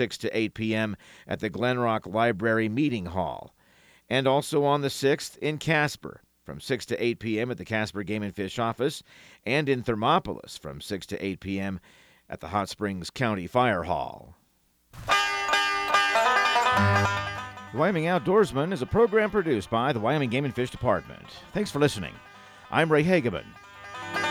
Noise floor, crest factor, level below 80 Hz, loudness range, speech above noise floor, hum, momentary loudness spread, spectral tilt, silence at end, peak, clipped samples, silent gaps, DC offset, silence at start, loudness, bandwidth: -67 dBFS; 20 dB; -56 dBFS; 6 LU; 40 dB; none; 16 LU; -5 dB/octave; 0 s; -8 dBFS; under 0.1%; none; under 0.1%; 0 s; -26 LUFS; over 20 kHz